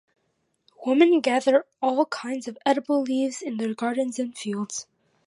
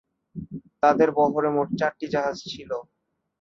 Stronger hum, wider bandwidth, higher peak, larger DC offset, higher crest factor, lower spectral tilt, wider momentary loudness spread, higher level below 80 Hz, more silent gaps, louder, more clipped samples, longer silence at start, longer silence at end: neither; first, 11.5 kHz vs 7.6 kHz; about the same, -6 dBFS vs -6 dBFS; neither; about the same, 18 dB vs 20 dB; second, -4 dB/octave vs -6 dB/octave; second, 12 LU vs 19 LU; second, -80 dBFS vs -60 dBFS; neither; about the same, -24 LUFS vs -24 LUFS; neither; first, 0.8 s vs 0.35 s; second, 0.45 s vs 0.6 s